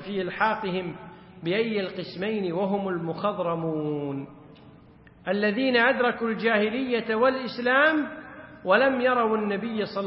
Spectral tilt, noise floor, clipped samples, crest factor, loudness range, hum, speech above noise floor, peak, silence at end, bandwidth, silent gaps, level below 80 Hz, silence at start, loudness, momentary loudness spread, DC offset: -10 dB/octave; -52 dBFS; under 0.1%; 18 dB; 6 LU; none; 27 dB; -8 dBFS; 0 s; 5.8 kHz; none; -64 dBFS; 0 s; -25 LUFS; 15 LU; under 0.1%